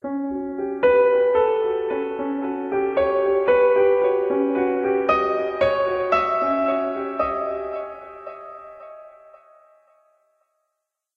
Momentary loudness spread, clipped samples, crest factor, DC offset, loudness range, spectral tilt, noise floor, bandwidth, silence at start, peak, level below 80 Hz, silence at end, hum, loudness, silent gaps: 20 LU; under 0.1%; 18 dB; under 0.1%; 11 LU; -7 dB/octave; -80 dBFS; 5.8 kHz; 0.05 s; -4 dBFS; -54 dBFS; 2.1 s; none; -21 LUFS; none